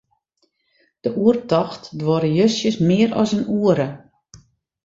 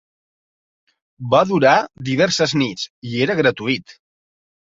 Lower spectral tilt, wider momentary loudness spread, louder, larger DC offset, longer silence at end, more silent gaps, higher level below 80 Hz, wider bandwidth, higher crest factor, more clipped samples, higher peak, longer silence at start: first, -6.5 dB/octave vs -5 dB/octave; about the same, 9 LU vs 11 LU; about the same, -19 LUFS vs -18 LUFS; neither; second, 0.45 s vs 0.75 s; second, none vs 2.90-3.02 s; about the same, -56 dBFS vs -58 dBFS; about the same, 7.8 kHz vs 7.8 kHz; about the same, 18 dB vs 18 dB; neither; about the same, -2 dBFS vs -2 dBFS; second, 1.05 s vs 1.2 s